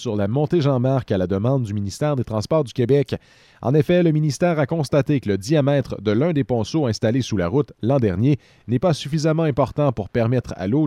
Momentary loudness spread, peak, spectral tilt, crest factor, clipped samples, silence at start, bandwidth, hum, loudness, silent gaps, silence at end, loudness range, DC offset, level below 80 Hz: 4 LU; -4 dBFS; -7.5 dB/octave; 16 dB; under 0.1%; 0 s; 12.5 kHz; none; -20 LUFS; none; 0 s; 1 LU; under 0.1%; -48 dBFS